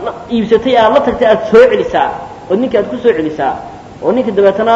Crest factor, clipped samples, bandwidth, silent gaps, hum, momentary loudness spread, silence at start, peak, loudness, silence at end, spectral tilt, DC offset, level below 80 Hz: 12 dB; 0.6%; 7.8 kHz; none; none; 10 LU; 0 s; 0 dBFS; -11 LUFS; 0 s; -6.5 dB/octave; under 0.1%; -42 dBFS